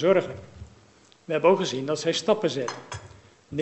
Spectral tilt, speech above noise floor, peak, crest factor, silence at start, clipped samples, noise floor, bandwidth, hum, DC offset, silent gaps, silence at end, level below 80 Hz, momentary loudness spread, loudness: -4.5 dB/octave; 32 dB; -6 dBFS; 20 dB; 0 s; under 0.1%; -56 dBFS; 8.4 kHz; none; under 0.1%; none; 0 s; -58 dBFS; 19 LU; -25 LUFS